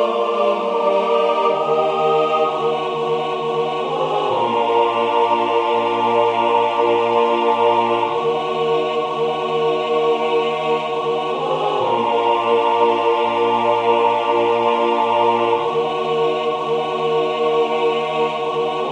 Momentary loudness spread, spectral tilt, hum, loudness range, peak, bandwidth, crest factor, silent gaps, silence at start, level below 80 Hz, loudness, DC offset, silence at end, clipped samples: 5 LU; -5.5 dB/octave; none; 2 LU; -4 dBFS; 9 kHz; 14 dB; none; 0 s; -66 dBFS; -18 LUFS; under 0.1%; 0 s; under 0.1%